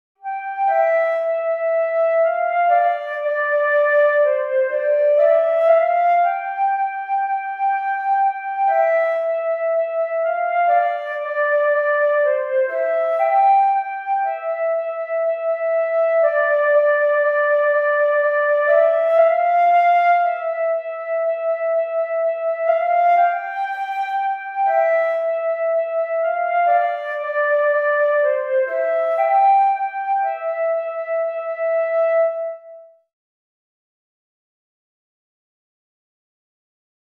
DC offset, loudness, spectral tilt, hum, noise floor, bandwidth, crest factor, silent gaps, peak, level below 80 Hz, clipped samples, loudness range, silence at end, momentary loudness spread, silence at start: under 0.1%; -18 LUFS; -0.5 dB/octave; none; -42 dBFS; 4.2 kHz; 14 dB; none; -4 dBFS; under -90 dBFS; under 0.1%; 4 LU; 4.3 s; 8 LU; 0.25 s